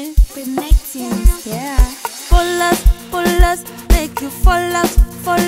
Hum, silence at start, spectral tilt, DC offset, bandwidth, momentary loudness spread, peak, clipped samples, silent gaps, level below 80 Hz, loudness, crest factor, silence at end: none; 0 s; -5 dB/octave; under 0.1%; 16.5 kHz; 8 LU; 0 dBFS; under 0.1%; none; -14 dBFS; -17 LUFS; 14 dB; 0 s